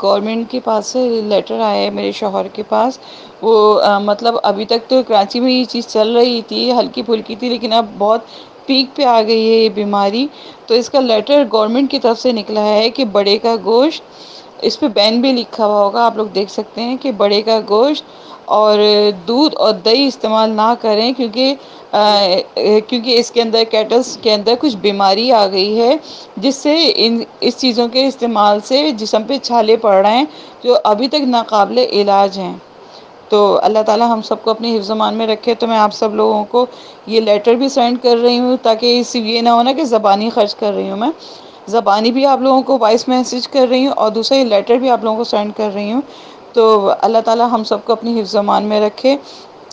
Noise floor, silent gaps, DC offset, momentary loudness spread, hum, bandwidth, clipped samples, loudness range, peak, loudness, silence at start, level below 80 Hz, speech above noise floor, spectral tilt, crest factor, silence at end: -37 dBFS; none; under 0.1%; 8 LU; none; 9 kHz; under 0.1%; 2 LU; 0 dBFS; -13 LUFS; 0 s; -62 dBFS; 24 dB; -4.5 dB/octave; 14 dB; 0.3 s